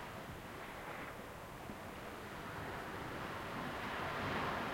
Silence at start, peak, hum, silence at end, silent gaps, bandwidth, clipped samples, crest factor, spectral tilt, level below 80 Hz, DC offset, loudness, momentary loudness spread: 0 s; -28 dBFS; none; 0 s; none; 16.5 kHz; under 0.1%; 18 dB; -5 dB/octave; -62 dBFS; under 0.1%; -44 LUFS; 10 LU